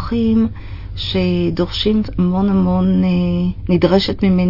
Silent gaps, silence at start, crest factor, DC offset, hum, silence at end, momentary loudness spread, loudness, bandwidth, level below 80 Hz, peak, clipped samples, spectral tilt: none; 0 s; 16 dB; under 0.1%; none; 0 s; 6 LU; -16 LUFS; 5.8 kHz; -32 dBFS; 0 dBFS; under 0.1%; -8.5 dB/octave